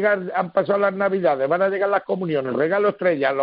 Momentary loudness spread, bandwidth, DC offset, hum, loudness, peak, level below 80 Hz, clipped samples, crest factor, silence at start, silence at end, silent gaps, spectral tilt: 3 LU; 5.2 kHz; under 0.1%; none; -21 LUFS; -6 dBFS; -70 dBFS; under 0.1%; 14 dB; 0 s; 0 s; none; -4.5 dB/octave